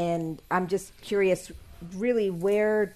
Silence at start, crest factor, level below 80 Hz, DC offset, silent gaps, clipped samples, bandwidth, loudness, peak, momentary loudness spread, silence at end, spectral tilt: 0 s; 16 dB; -54 dBFS; under 0.1%; none; under 0.1%; 13.5 kHz; -27 LUFS; -12 dBFS; 13 LU; 0.05 s; -6 dB/octave